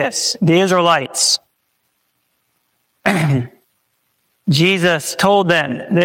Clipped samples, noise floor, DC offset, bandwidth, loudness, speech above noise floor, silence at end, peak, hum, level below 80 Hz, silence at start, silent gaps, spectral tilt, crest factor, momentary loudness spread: under 0.1%; -67 dBFS; under 0.1%; 17 kHz; -15 LUFS; 52 dB; 0 s; -2 dBFS; none; -58 dBFS; 0 s; none; -4 dB/octave; 16 dB; 7 LU